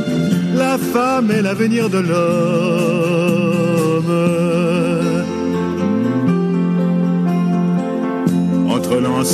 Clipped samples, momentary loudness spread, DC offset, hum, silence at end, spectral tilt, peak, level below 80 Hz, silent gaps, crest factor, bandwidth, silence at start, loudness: under 0.1%; 3 LU; under 0.1%; none; 0 s; -6.5 dB/octave; -2 dBFS; -56 dBFS; none; 12 dB; 14.5 kHz; 0 s; -16 LUFS